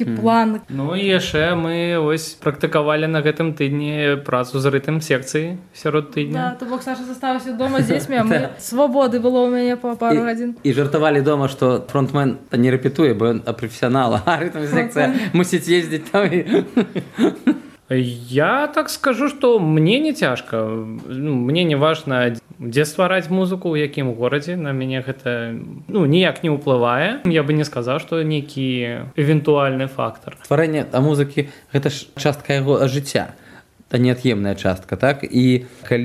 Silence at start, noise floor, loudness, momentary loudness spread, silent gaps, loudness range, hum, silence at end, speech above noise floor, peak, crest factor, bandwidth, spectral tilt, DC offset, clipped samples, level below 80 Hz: 0 s; -46 dBFS; -19 LUFS; 7 LU; none; 3 LU; none; 0 s; 28 dB; 0 dBFS; 18 dB; 14.5 kHz; -6 dB/octave; under 0.1%; under 0.1%; -56 dBFS